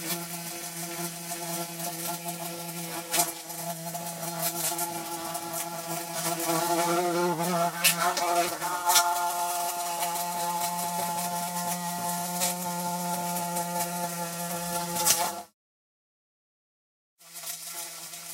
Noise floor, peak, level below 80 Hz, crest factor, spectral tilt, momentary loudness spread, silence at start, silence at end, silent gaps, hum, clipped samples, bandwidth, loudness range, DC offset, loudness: under -90 dBFS; -4 dBFS; -74 dBFS; 26 dB; -2.5 dB/octave; 11 LU; 0 s; 0 s; 15.54-17.17 s; none; under 0.1%; 16 kHz; 6 LU; under 0.1%; -29 LUFS